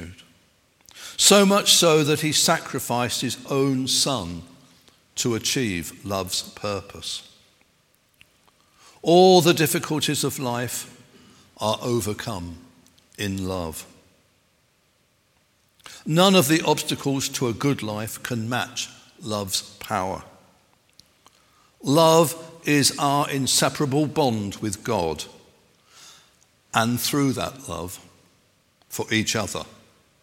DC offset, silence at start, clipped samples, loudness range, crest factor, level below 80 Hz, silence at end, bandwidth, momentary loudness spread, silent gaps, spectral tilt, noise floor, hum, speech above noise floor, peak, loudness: under 0.1%; 0 s; under 0.1%; 10 LU; 22 dB; -58 dBFS; 0.55 s; 17 kHz; 18 LU; none; -3.5 dB/octave; -64 dBFS; none; 42 dB; -2 dBFS; -22 LUFS